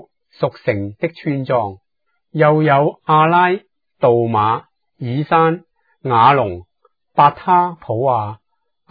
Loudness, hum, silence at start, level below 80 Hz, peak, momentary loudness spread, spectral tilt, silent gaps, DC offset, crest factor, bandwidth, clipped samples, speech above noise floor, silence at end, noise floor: -16 LUFS; none; 0.4 s; -58 dBFS; 0 dBFS; 12 LU; -10 dB/octave; none; under 0.1%; 16 dB; 5 kHz; under 0.1%; 57 dB; 0.55 s; -72 dBFS